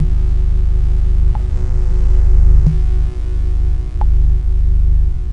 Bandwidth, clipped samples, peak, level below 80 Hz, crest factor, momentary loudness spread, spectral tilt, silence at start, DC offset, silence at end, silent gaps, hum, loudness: 2.6 kHz; under 0.1%; 0 dBFS; -12 dBFS; 10 dB; 6 LU; -9 dB/octave; 0 s; under 0.1%; 0 s; none; 50 Hz at -15 dBFS; -17 LUFS